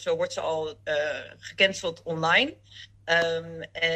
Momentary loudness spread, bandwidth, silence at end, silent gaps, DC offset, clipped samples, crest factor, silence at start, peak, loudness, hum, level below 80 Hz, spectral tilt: 17 LU; 10.5 kHz; 0 s; none; under 0.1%; under 0.1%; 20 dB; 0 s; -8 dBFS; -26 LUFS; none; -62 dBFS; -3 dB/octave